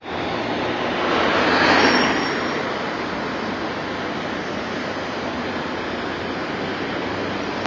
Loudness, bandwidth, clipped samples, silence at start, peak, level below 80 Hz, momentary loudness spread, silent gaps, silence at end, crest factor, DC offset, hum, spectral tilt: -22 LUFS; 7.8 kHz; under 0.1%; 0 s; -2 dBFS; -48 dBFS; 10 LU; none; 0 s; 20 dB; under 0.1%; none; -4.5 dB/octave